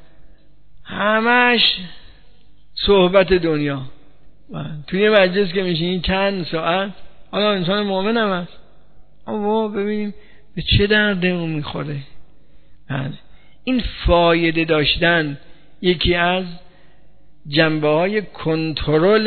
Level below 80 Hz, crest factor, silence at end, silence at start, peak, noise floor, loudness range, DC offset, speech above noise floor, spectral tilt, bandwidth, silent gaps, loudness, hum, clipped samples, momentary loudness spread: -36 dBFS; 20 dB; 0 s; 0.2 s; 0 dBFS; -52 dBFS; 4 LU; 1%; 34 dB; -9 dB/octave; 4.6 kHz; none; -18 LUFS; none; under 0.1%; 16 LU